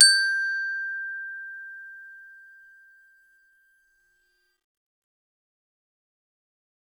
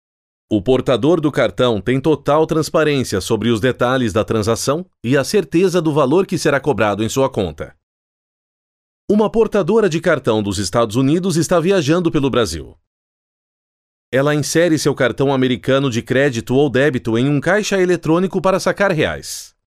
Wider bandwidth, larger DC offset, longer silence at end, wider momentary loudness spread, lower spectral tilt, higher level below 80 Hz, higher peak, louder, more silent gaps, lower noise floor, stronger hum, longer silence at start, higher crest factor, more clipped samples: about the same, 15.5 kHz vs 15.5 kHz; neither; first, 4.6 s vs 0.25 s; first, 24 LU vs 4 LU; second, 8.5 dB/octave vs -5.5 dB/octave; second, -82 dBFS vs -44 dBFS; about the same, -2 dBFS vs -4 dBFS; second, -24 LUFS vs -16 LUFS; second, none vs 7.83-9.08 s, 12.87-14.12 s; second, -69 dBFS vs under -90 dBFS; neither; second, 0 s vs 0.5 s; first, 28 dB vs 14 dB; neither